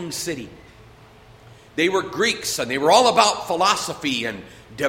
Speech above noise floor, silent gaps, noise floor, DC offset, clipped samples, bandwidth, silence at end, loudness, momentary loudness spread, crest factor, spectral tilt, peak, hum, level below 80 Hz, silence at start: 27 dB; none; -47 dBFS; under 0.1%; under 0.1%; 16.5 kHz; 0 s; -20 LUFS; 18 LU; 20 dB; -2.5 dB/octave; -2 dBFS; none; -56 dBFS; 0 s